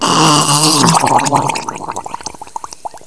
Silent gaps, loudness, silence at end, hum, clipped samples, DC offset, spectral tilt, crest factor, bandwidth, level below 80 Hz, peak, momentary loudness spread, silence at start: none; -10 LUFS; 0.1 s; none; 0.1%; 1%; -3 dB/octave; 14 dB; 11 kHz; -48 dBFS; 0 dBFS; 18 LU; 0 s